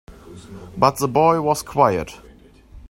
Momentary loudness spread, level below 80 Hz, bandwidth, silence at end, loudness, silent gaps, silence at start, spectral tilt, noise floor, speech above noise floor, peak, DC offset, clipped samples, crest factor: 20 LU; -46 dBFS; 16.5 kHz; 0.1 s; -18 LUFS; none; 0.1 s; -5.5 dB/octave; -47 dBFS; 28 dB; 0 dBFS; under 0.1%; under 0.1%; 20 dB